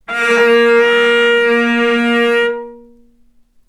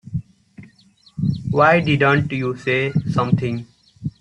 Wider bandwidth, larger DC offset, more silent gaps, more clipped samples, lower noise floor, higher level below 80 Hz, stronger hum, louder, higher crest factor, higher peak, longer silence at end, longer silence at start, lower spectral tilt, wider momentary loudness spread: first, 12 kHz vs 9.2 kHz; neither; neither; neither; about the same, -50 dBFS vs -53 dBFS; second, -56 dBFS vs -48 dBFS; neither; first, -11 LUFS vs -18 LUFS; second, 12 dB vs 18 dB; about the same, 0 dBFS vs -2 dBFS; first, 0.9 s vs 0.1 s; about the same, 0.1 s vs 0.05 s; second, -3.5 dB/octave vs -7.5 dB/octave; second, 5 LU vs 16 LU